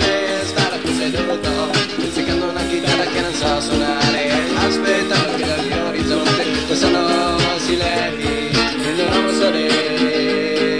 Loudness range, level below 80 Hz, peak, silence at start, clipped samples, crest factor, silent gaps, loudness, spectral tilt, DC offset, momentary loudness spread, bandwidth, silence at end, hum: 2 LU; -38 dBFS; -4 dBFS; 0 s; under 0.1%; 14 dB; none; -17 LUFS; -4 dB/octave; 0.5%; 4 LU; 10.5 kHz; 0 s; none